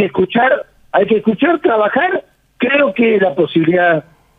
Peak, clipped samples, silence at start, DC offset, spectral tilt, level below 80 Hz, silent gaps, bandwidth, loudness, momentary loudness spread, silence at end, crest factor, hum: -2 dBFS; under 0.1%; 0 s; under 0.1%; -8.5 dB/octave; -54 dBFS; none; 4.6 kHz; -14 LUFS; 6 LU; 0.35 s; 12 dB; none